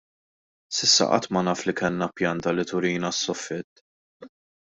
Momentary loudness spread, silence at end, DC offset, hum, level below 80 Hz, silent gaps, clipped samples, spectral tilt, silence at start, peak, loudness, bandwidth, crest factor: 13 LU; 0.5 s; under 0.1%; none; -64 dBFS; 3.64-4.20 s; under 0.1%; -3 dB/octave; 0.7 s; -6 dBFS; -24 LUFS; 8 kHz; 22 dB